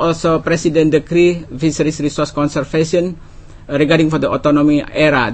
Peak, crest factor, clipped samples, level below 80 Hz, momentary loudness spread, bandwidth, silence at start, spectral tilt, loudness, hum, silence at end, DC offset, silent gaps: 0 dBFS; 14 dB; under 0.1%; -38 dBFS; 6 LU; 8.8 kHz; 0 s; -6 dB/octave; -15 LUFS; none; 0 s; under 0.1%; none